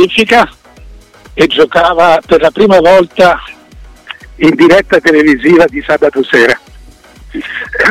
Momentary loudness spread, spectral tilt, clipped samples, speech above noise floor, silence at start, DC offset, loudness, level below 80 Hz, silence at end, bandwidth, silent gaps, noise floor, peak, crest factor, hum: 14 LU; -5 dB/octave; under 0.1%; 28 dB; 0 s; under 0.1%; -8 LUFS; -36 dBFS; 0 s; 15.5 kHz; none; -36 dBFS; 0 dBFS; 8 dB; none